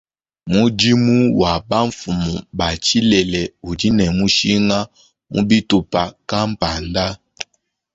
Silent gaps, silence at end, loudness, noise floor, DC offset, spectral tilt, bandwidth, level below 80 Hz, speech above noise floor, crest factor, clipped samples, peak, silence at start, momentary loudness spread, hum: none; 0.5 s; -17 LUFS; -68 dBFS; under 0.1%; -5 dB/octave; 8 kHz; -38 dBFS; 51 dB; 16 dB; under 0.1%; -2 dBFS; 0.45 s; 11 LU; none